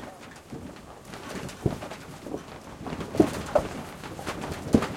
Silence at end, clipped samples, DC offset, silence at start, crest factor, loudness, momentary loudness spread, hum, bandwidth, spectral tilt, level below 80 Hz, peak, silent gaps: 0 s; under 0.1%; under 0.1%; 0 s; 26 dB; -31 LUFS; 18 LU; none; 16.5 kHz; -6 dB/octave; -48 dBFS; -4 dBFS; none